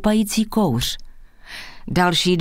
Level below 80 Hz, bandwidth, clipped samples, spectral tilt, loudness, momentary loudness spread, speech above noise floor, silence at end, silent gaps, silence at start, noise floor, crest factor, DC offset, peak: -38 dBFS; 16 kHz; under 0.1%; -4.5 dB/octave; -19 LUFS; 19 LU; 20 dB; 0 s; none; 0 s; -39 dBFS; 18 dB; under 0.1%; -4 dBFS